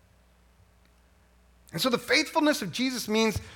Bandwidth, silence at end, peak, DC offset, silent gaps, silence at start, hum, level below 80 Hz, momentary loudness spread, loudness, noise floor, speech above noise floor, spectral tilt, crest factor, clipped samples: 17.5 kHz; 0 s; -10 dBFS; under 0.1%; none; 1.75 s; 60 Hz at -55 dBFS; -56 dBFS; 6 LU; -26 LUFS; -61 dBFS; 34 dB; -3.5 dB/octave; 20 dB; under 0.1%